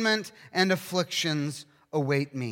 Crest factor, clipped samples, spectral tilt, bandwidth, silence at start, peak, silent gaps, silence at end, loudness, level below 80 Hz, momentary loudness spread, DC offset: 18 dB; under 0.1%; -4.5 dB/octave; 17 kHz; 0 s; -10 dBFS; none; 0 s; -28 LUFS; -78 dBFS; 8 LU; under 0.1%